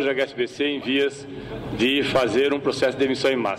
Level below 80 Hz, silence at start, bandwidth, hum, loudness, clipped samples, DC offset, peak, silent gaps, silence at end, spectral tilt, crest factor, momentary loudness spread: -52 dBFS; 0 s; 15 kHz; none; -22 LUFS; under 0.1%; under 0.1%; -10 dBFS; none; 0 s; -4.5 dB/octave; 12 dB; 11 LU